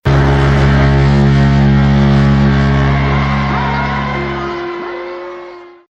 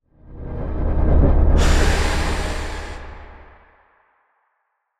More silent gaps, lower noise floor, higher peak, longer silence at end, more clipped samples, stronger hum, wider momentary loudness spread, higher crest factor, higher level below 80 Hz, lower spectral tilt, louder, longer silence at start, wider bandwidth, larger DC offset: neither; second, -32 dBFS vs -72 dBFS; first, 0 dBFS vs -4 dBFS; second, 0.2 s vs 1.6 s; neither; neither; second, 14 LU vs 19 LU; about the same, 12 dB vs 16 dB; about the same, -20 dBFS vs -20 dBFS; first, -8 dB/octave vs -5.5 dB/octave; first, -12 LUFS vs -20 LUFS; second, 0.05 s vs 0.25 s; second, 7.4 kHz vs 13 kHz; neither